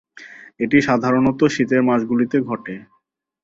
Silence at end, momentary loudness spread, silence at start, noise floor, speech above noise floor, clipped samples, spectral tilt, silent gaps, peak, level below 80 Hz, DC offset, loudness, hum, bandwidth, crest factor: 0.6 s; 15 LU; 0.2 s; -66 dBFS; 48 dB; under 0.1%; -6.5 dB/octave; none; -2 dBFS; -54 dBFS; under 0.1%; -18 LUFS; none; 7.8 kHz; 18 dB